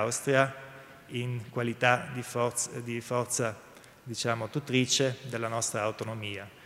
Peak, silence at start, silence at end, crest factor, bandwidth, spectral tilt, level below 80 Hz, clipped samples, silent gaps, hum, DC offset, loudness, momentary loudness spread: -8 dBFS; 0 s; 0 s; 24 dB; 16 kHz; -3.5 dB/octave; -70 dBFS; under 0.1%; none; none; under 0.1%; -30 LUFS; 13 LU